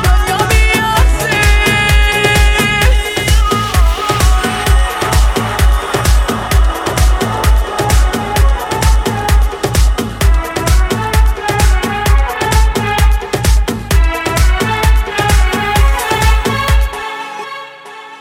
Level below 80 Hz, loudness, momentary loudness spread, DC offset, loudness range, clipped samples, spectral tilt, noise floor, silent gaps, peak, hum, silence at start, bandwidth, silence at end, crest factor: -12 dBFS; -12 LUFS; 5 LU; 0.2%; 3 LU; under 0.1%; -4.5 dB/octave; -31 dBFS; none; 0 dBFS; none; 0 s; 16.5 kHz; 0 s; 10 dB